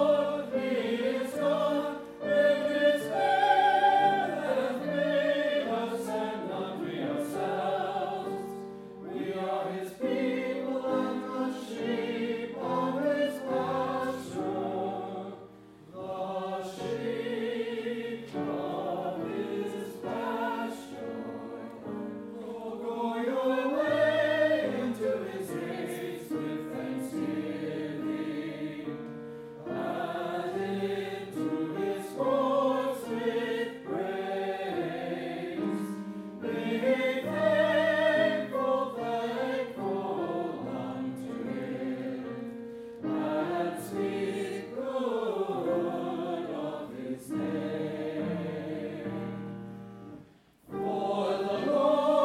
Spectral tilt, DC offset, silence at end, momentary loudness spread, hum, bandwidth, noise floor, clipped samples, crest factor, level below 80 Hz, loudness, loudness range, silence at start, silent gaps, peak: -6 dB/octave; under 0.1%; 0 s; 13 LU; none; 16 kHz; -57 dBFS; under 0.1%; 20 dB; -72 dBFS; -31 LUFS; 9 LU; 0 s; none; -12 dBFS